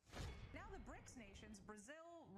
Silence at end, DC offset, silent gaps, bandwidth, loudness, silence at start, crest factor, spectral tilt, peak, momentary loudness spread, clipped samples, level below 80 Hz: 0 s; under 0.1%; none; 15 kHz; -58 LUFS; 0.05 s; 16 dB; -4.5 dB/octave; -42 dBFS; 5 LU; under 0.1%; -64 dBFS